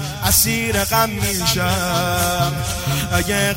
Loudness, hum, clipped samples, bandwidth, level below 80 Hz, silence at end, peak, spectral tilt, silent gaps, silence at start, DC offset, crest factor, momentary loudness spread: -17 LUFS; none; under 0.1%; 16.5 kHz; -34 dBFS; 0 s; -2 dBFS; -3.5 dB/octave; none; 0 s; under 0.1%; 18 dB; 6 LU